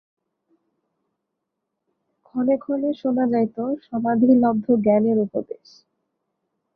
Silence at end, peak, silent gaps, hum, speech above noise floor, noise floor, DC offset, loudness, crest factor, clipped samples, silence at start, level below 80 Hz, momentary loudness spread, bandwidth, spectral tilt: 1.2 s; -6 dBFS; none; none; 60 dB; -80 dBFS; under 0.1%; -21 LUFS; 18 dB; under 0.1%; 2.35 s; -68 dBFS; 12 LU; 5.6 kHz; -10 dB/octave